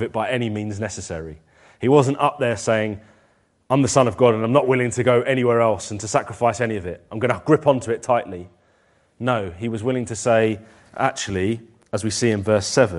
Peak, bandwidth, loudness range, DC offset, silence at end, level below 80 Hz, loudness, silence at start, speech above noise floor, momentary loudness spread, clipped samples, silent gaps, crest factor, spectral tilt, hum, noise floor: 0 dBFS; 11.5 kHz; 4 LU; under 0.1%; 0 s; -54 dBFS; -21 LUFS; 0 s; 41 dB; 13 LU; under 0.1%; none; 20 dB; -5.5 dB/octave; none; -61 dBFS